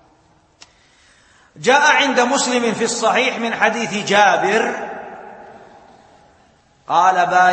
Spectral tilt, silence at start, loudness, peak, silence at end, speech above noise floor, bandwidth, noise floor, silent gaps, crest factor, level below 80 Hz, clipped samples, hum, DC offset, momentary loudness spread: -2.5 dB/octave; 1.6 s; -15 LUFS; 0 dBFS; 0 s; 39 dB; 8.8 kHz; -55 dBFS; none; 18 dB; -64 dBFS; under 0.1%; none; under 0.1%; 13 LU